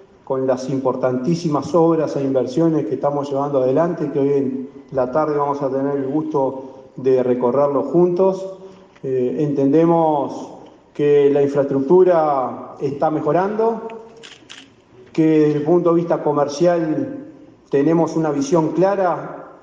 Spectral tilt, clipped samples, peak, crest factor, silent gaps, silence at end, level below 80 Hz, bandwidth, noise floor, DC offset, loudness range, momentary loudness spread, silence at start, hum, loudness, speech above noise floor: -8 dB/octave; under 0.1%; -4 dBFS; 14 dB; none; 0.05 s; -62 dBFS; 7.8 kHz; -46 dBFS; under 0.1%; 3 LU; 12 LU; 0.3 s; none; -18 LUFS; 29 dB